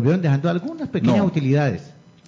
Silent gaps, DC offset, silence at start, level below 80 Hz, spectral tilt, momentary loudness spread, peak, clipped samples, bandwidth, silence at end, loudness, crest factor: none; under 0.1%; 0 s; -52 dBFS; -8.5 dB/octave; 8 LU; -6 dBFS; under 0.1%; 7.6 kHz; 0.4 s; -20 LUFS; 14 dB